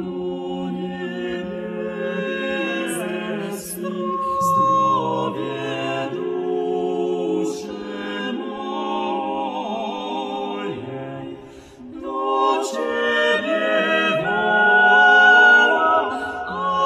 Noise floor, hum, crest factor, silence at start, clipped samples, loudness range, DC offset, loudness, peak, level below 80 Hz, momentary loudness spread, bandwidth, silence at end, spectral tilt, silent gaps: -40 dBFS; none; 18 dB; 0 s; under 0.1%; 12 LU; under 0.1%; -20 LUFS; -2 dBFS; -60 dBFS; 16 LU; 14 kHz; 0 s; -4 dB/octave; none